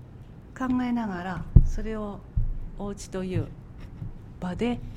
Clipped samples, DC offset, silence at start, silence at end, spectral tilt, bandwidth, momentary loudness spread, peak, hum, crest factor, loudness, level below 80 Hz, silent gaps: under 0.1%; under 0.1%; 0 s; 0 s; -7.5 dB/octave; 10.5 kHz; 21 LU; 0 dBFS; none; 26 dB; -29 LUFS; -30 dBFS; none